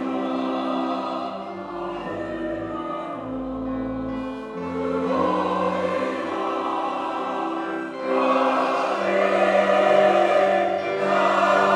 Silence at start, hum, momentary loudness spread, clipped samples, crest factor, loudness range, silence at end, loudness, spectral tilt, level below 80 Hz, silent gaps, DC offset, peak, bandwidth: 0 s; none; 12 LU; under 0.1%; 18 dB; 10 LU; 0 s; -23 LUFS; -5.5 dB/octave; -54 dBFS; none; under 0.1%; -4 dBFS; 11 kHz